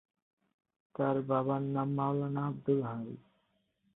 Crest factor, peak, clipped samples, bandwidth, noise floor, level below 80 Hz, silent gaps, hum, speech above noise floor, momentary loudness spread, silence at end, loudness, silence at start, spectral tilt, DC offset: 16 dB; -18 dBFS; under 0.1%; 4 kHz; -76 dBFS; -74 dBFS; none; none; 44 dB; 13 LU; 0.75 s; -33 LUFS; 1 s; -9 dB/octave; under 0.1%